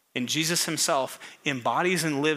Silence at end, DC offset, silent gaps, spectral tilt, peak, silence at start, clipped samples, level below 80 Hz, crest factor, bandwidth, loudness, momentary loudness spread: 0 s; under 0.1%; none; -3 dB/octave; -10 dBFS; 0.15 s; under 0.1%; -80 dBFS; 16 dB; 16 kHz; -26 LUFS; 7 LU